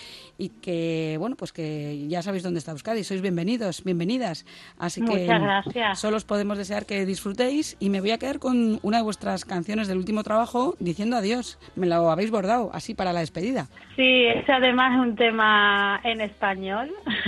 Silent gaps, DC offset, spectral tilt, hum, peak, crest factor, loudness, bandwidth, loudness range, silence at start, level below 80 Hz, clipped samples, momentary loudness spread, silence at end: none; under 0.1%; -5 dB/octave; none; -6 dBFS; 18 dB; -24 LUFS; 12.5 kHz; 8 LU; 0 s; -56 dBFS; under 0.1%; 12 LU; 0 s